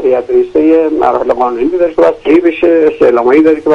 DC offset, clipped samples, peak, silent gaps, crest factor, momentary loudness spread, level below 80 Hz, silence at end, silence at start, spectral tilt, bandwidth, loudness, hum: under 0.1%; 0.1%; 0 dBFS; none; 8 dB; 4 LU; -42 dBFS; 0 s; 0 s; -7 dB/octave; 6.8 kHz; -9 LUFS; none